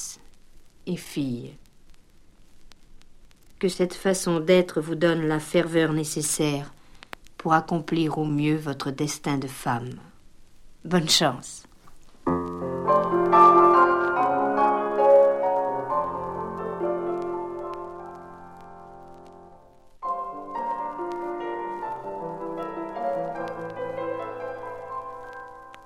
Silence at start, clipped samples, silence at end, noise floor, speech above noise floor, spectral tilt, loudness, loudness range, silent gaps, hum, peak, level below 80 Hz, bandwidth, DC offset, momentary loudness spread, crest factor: 0 s; under 0.1%; 0 s; -51 dBFS; 28 dB; -4.5 dB/octave; -24 LUFS; 15 LU; none; none; -4 dBFS; -54 dBFS; 16 kHz; under 0.1%; 21 LU; 22 dB